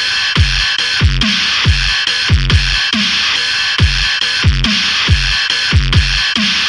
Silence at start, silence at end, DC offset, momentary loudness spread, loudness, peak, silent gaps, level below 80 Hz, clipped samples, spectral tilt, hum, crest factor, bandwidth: 0 s; 0 s; under 0.1%; 1 LU; -11 LUFS; 0 dBFS; none; -20 dBFS; under 0.1%; -3 dB/octave; none; 12 dB; 11.5 kHz